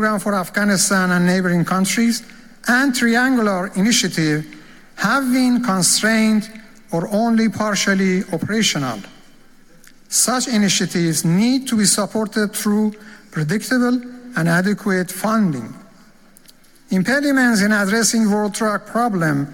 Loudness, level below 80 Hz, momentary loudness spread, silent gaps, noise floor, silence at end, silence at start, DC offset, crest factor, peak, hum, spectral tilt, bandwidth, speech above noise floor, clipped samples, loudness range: -17 LUFS; -54 dBFS; 8 LU; none; -47 dBFS; 0 s; 0 s; under 0.1%; 16 dB; -2 dBFS; none; -4 dB/octave; 17 kHz; 30 dB; under 0.1%; 3 LU